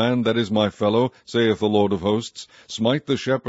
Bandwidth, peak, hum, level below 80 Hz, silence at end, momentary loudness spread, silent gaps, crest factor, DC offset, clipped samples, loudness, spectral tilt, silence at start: 8 kHz; -4 dBFS; none; -58 dBFS; 0 s; 6 LU; none; 16 dB; under 0.1%; under 0.1%; -21 LUFS; -6 dB/octave; 0 s